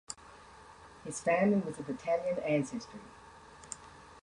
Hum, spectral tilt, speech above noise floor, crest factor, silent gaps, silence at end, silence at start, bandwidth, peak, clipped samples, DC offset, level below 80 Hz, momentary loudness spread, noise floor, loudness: none; -5.5 dB/octave; 22 dB; 18 dB; none; 0.05 s; 0.1 s; 11 kHz; -18 dBFS; under 0.1%; under 0.1%; -66 dBFS; 25 LU; -55 dBFS; -33 LUFS